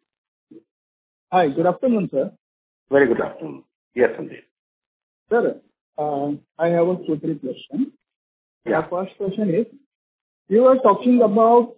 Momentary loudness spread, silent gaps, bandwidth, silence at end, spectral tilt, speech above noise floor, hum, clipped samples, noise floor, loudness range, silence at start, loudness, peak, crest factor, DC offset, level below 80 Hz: 16 LU; 0.71-1.27 s, 2.40-2.87 s, 3.75-3.91 s, 4.51-5.26 s, 5.81-5.93 s, 8.16-8.61 s, 9.86-10.46 s; 4 kHz; 0.05 s; -11 dB/octave; over 71 dB; none; under 0.1%; under -90 dBFS; 6 LU; 0.55 s; -20 LUFS; -2 dBFS; 18 dB; under 0.1%; -64 dBFS